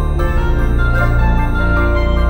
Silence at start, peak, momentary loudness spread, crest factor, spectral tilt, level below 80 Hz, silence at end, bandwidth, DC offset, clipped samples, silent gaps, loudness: 0 s; -2 dBFS; 2 LU; 10 dB; -8 dB/octave; -14 dBFS; 0 s; 9.2 kHz; under 0.1%; under 0.1%; none; -16 LUFS